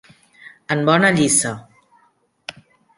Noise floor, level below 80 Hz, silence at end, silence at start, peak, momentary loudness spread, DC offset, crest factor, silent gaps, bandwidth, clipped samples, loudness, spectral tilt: -61 dBFS; -58 dBFS; 0.45 s; 0.45 s; -2 dBFS; 22 LU; under 0.1%; 20 dB; none; 11.5 kHz; under 0.1%; -16 LUFS; -3.5 dB/octave